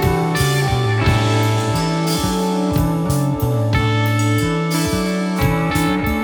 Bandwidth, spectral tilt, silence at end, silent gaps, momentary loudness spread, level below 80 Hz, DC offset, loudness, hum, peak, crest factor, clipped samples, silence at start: 20 kHz; -5.5 dB/octave; 0 s; none; 2 LU; -32 dBFS; under 0.1%; -18 LUFS; none; -2 dBFS; 14 dB; under 0.1%; 0 s